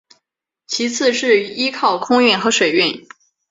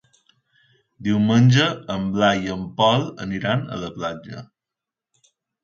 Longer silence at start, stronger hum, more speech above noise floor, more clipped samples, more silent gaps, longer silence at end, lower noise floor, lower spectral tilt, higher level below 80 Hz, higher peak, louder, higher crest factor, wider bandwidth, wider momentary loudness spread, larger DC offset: second, 0.7 s vs 1 s; neither; second, 62 dB vs 67 dB; neither; neither; second, 0.5 s vs 1.2 s; second, -78 dBFS vs -87 dBFS; second, -2.5 dB/octave vs -6 dB/octave; second, -62 dBFS vs -54 dBFS; about the same, -2 dBFS vs -4 dBFS; first, -16 LUFS vs -21 LUFS; about the same, 16 dB vs 18 dB; about the same, 7.8 kHz vs 7.4 kHz; second, 8 LU vs 14 LU; neither